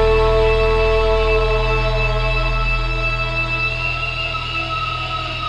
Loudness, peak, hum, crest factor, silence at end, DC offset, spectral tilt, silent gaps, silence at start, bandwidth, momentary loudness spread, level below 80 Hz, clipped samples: -18 LUFS; -4 dBFS; none; 14 dB; 0 s; 0.6%; -5.5 dB/octave; none; 0 s; 8.6 kHz; 6 LU; -22 dBFS; under 0.1%